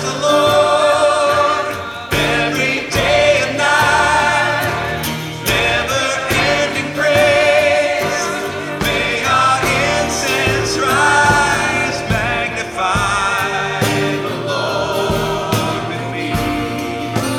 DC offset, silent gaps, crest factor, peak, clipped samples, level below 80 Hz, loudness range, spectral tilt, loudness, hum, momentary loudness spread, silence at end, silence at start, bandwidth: under 0.1%; none; 14 dB; 0 dBFS; under 0.1%; -38 dBFS; 3 LU; -3.5 dB/octave; -15 LUFS; none; 8 LU; 0 s; 0 s; 19 kHz